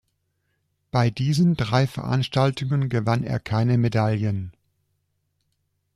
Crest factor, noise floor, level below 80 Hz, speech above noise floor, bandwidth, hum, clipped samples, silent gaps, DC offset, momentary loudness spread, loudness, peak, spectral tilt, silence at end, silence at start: 16 dB; -73 dBFS; -54 dBFS; 52 dB; 12 kHz; none; under 0.1%; none; under 0.1%; 5 LU; -23 LUFS; -6 dBFS; -7 dB/octave; 1.45 s; 0.95 s